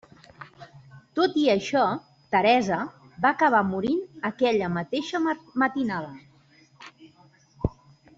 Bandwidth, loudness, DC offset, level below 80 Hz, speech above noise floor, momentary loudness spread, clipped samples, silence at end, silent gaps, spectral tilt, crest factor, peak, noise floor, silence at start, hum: 7.8 kHz; -25 LUFS; under 0.1%; -54 dBFS; 34 dB; 14 LU; under 0.1%; 0.5 s; none; -6 dB/octave; 18 dB; -8 dBFS; -58 dBFS; 0.4 s; none